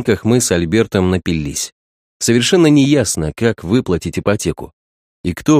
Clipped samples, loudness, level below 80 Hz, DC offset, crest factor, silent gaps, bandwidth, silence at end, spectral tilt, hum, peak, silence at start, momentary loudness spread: under 0.1%; -15 LUFS; -38 dBFS; under 0.1%; 16 dB; 1.72-2.20 s, 4.73-5.24 s; 15.5 kHz; 0 s; -5 dB/octave; none; 0 dBFS; 0 s; 12 LU